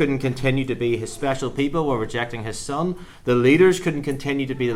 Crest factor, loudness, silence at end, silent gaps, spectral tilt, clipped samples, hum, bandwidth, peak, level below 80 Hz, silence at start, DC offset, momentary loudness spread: 18 dB; -22 LUFS; 0 s; none; -6 dB/octave; under 0.1%; none; 15 kHz; -4 dBFS; -42 dBFS; 0 s; under 0.1%; 11 LU